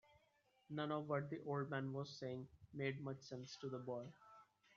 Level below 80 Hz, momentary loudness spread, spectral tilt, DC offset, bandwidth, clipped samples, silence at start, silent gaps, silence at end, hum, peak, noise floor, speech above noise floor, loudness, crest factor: -82 dBFS; 12 LU; -5.5 dB/octave; under 0.1%; 7.4 kHz; under 0.1%; 0.1 s; none; 0.3 s; none; -28 dBFS; -79 dBFS; 32 dB; -47 LUFS; 20 dB